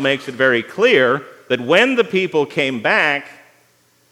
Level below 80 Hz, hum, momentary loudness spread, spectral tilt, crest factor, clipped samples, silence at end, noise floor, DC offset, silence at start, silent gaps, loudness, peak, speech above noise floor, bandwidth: -72 dBFS; none; 9 LU; -4.5 dB/octave; 16 dB; under 0.1%; 0.8 s; -57 dBFS; under 0.1%; 0 s; none; -16 LUFS; 0 dBFS; 41 dB; 13.5 kHz